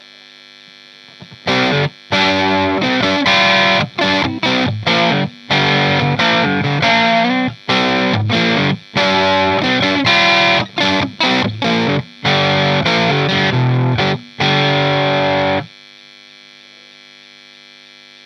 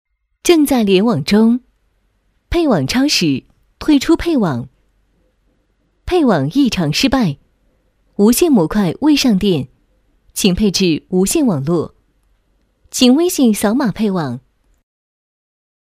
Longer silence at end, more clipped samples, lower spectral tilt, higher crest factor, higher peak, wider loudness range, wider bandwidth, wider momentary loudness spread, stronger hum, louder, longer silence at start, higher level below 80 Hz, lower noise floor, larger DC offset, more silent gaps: first, 2.6 s vs 1.45 s; neither; about the same, -5 dB/octave vs -5 dB/octave; about the same, 14 dB vs 16 dB; about the same, 0 dBFS vs 0 dBFS; about the same, 4 LU vs 3 LU; second, 10 kHz vs 16 kHz; second, 6 LU vs 11 LU; first, 50 Hz at -45 dBFS vs none; about the same, -14 LUFS vs -14 LUFS; first, 1.2 s vs 0.45 s; second, -50 dBFS vs -38 dBFS; second, -41 dBFS vs -61 dBFS; neither; neither